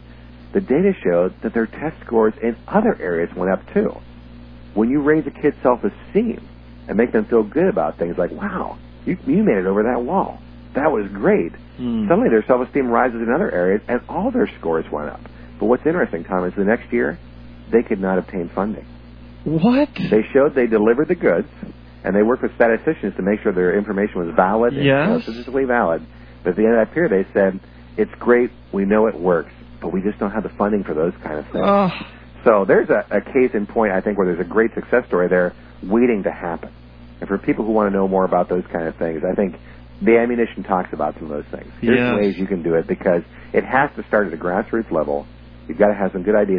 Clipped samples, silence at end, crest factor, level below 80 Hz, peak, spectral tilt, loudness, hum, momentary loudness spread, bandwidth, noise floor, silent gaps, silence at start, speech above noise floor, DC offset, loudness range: under 0.1%; 0 s; 18 dB; -42 dBFS; 0 dBFS; -10.5 dB/octave; -19 LUFS; none; 11 LU; 5.2 kHz; -40 dBFS; none; 0.1 s; 22 dB; under 0.1%; 3 LU